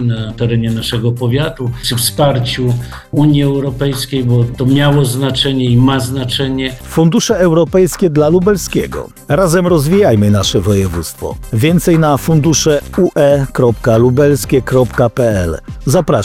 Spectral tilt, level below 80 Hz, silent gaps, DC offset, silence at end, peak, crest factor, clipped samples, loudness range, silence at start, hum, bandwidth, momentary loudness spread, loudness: -5.5 dB/octave; -32 dBFS; none; under 0.1%; 0 s; 0 dBFS; 10 dB; under 0.1%; 3 LU; 0 s; none; 16.5 kHz; 7 LU; -12 LUFS